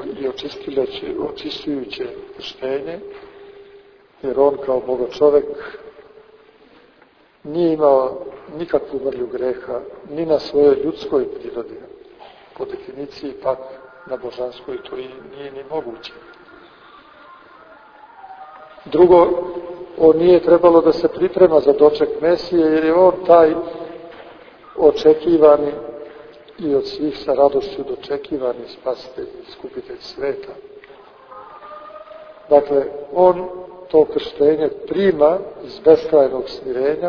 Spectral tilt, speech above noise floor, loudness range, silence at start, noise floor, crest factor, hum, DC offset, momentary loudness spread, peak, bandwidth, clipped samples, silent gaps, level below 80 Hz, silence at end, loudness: -7.5 dB/octave; 35 dB; 16 LU; 0 s; -52 dBFS; 18 dB; none; under 0.1%; 22 LU; 0 dBFS; 5.4 kHz; under 0.1%; none; -52 dBFS; 0 s; -17 LUFS